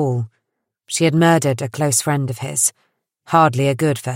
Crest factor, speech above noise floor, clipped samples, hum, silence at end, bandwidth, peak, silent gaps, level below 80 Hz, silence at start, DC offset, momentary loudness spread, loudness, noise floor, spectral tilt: 18 dB; 59 dB; under 0.1%; none; 0 s; 16.5 kHz; -2 dBFS; none; -60 dBFS; 0 s; under 0.1%; 8 LU; -17 LUFS; -76 dBFS; -4.5 dB/octave